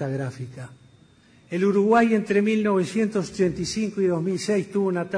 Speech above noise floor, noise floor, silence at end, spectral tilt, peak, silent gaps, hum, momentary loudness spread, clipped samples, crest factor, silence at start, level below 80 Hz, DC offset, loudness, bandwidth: 32 dB; -55 dBFS; 0 s; -6 dB/octave; -8 dBFS; none; none; 14 LU; under 0.1%; 16 dB; 0 s; -58 dBFS; under 0.1%; -23 LUFS; 10.5 kHz